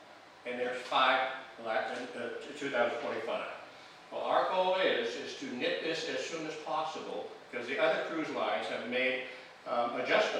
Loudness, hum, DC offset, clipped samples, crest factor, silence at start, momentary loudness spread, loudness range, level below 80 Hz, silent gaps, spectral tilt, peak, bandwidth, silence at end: -33 LUFS; none; under 0.1%; under 0.1%; 20 dB; 0 s; 13 LU; 2 LU; -84 dBFS; none; -3 dB/octave; -14 dBFS; 11.5 kHz; 0 s